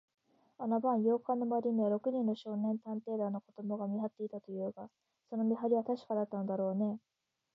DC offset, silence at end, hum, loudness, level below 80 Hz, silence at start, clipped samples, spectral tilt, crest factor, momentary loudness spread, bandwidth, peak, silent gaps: under 0.1%; 0.55 s; none; -36 LUFS; -90 dBFS; 0.6 s; under 0.1%; -8.5 dB/octave; 16 dB; 10 LU; 5.6 kHz; -20 dBFS; none